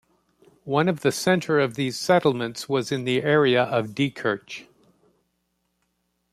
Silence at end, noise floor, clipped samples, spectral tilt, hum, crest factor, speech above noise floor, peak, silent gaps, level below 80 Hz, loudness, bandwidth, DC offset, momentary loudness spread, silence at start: 1.7 s; -74 dBFS; under 0.1%; -5 dB/octave; none; 20 dB; 51 dB; -6 dBFS; none; -66 dBFS; -23 LUFS; 15 kHz; under 0.1%; 9 LU; 0.65 s